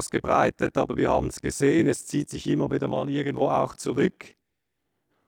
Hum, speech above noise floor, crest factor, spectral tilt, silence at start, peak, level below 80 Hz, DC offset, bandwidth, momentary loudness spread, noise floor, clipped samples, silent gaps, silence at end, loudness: none; 56 dB; 18 dB; -6 dB/octave; 0 s; -8 dBFS; -48 dBFS; under 0.1%; 17 kHz; 6 LU; -81 dBFS; under 0.1%; none; 1 s; -25 LUFS